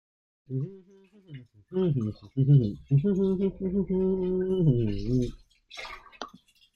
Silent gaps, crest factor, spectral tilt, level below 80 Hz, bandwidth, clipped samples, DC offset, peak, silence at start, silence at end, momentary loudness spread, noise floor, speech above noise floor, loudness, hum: none; 18 dB; -9.5 dB/octave; -48 dBFS; 6.8 kHz; under 0.1%; under 0.1%; -10 dBFS; 0.5 s; 0.45 s; 20 LU; -55 dBFS; 29 dB; -27 LUFS; none